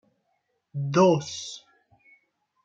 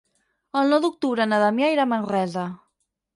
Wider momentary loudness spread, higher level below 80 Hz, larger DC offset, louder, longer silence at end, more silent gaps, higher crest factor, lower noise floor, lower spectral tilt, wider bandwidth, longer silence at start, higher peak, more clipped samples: first, 19 LU vs 9 LU; about the same, -72 dBFS vs -72 dBFS; neither; about the same, -24 LUFS vs -22 LUFS; first, 1.05 s vs 0.6 s; neither; first, 22 dB vs 16 dB; about the same, -75 dBFS vs -75 dBFS; about the same, -6 dB/octave vs -6 dB/octave; second, 8.8 kHz vs 11.5 kHz; first, 0.75 s vs 0.55 s; about the same, -8 dBFS vs -6 dBFS; neither